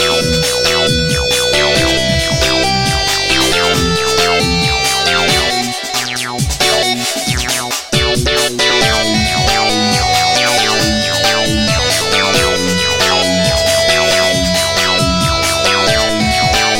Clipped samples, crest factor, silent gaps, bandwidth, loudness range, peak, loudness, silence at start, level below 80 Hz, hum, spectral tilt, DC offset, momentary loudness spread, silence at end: under 0.1%; 12 dB; none; 17 kHz; 2 LU; 0 dBFS; -11 LUFS; 0 s; -28 dBFS; none; -3 dB/octave; under 0.1%; 4 LU; 0 s